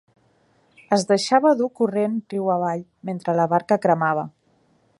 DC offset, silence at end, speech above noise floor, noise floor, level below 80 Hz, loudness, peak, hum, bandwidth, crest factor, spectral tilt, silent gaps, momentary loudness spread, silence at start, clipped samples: under 0.1%; 0.7 s; 41 dB; -62 dBFS; -70 dBFS; -21 LUFS; -2 dBFS; none; 11.5 kHz; 20 dB; -5.5 dB/octave; none; 10 LU; 0.9 s; under 0.1%